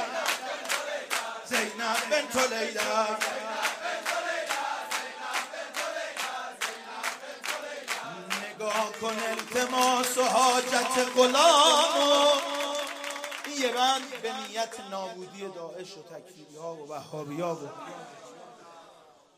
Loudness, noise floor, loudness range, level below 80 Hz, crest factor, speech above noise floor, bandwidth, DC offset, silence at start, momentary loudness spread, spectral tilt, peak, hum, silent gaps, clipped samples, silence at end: -27 LUFS; -56 dBFS; 15 LU; -78 dBFS; 22 dB; 29 dB; 15.5 kHz; under 0.1%; 0 s; 18 LU; -1 dB/octave; -6 dBFS; none; none; under 0.1%; 0.45 s